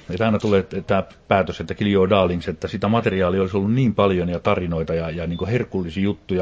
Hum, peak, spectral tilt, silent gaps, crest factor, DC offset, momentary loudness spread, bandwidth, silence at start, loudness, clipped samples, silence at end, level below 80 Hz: none; -2 dBFS; -8 dB/octave; none; 18 dB; under 0.1%; 7 LU; 7.8 kHz; 0.1 s; -21 LUFS; under 0.1%; 0 s; -40 dBFS